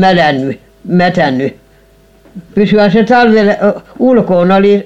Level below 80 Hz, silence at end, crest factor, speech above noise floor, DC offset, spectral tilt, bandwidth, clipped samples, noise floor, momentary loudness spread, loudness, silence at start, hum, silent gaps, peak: -44 dBFS; 0 s; 10 dB; 36 dB; 0.8%; -7.5 dB/octave; 8 kHz; under 0.1%; -45 dBFS; 10 LU; -10 LUFS; 0 s; none; none; 0 dBFS